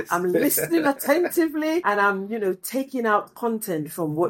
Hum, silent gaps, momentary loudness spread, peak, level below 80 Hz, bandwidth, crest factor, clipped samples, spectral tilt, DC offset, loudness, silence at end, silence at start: none; none; 7 LU; -6 dBFS; -66 dBFS; 17 kHz; 16 dB; under 0.1%; -4.5 dB/octave; under 0.1%; -23 LUFS; 0 s; 0 s